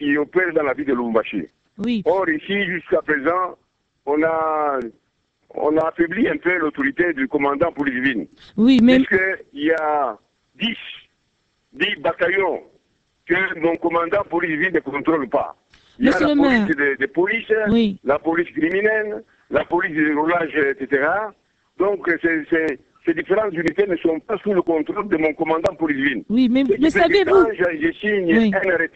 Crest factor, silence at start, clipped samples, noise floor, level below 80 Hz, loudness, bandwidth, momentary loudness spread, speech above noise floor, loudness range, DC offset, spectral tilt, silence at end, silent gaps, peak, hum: 18 dB; 0 s; under 0.1%; -68 dBFS; -52 dBFS; -19 LUFS; 8.2 kHz; 8 LU; 49 dB; 4 LU; under 0.1%; -6.5 dB/octave; 0.1 s; none; -2 dBFS; none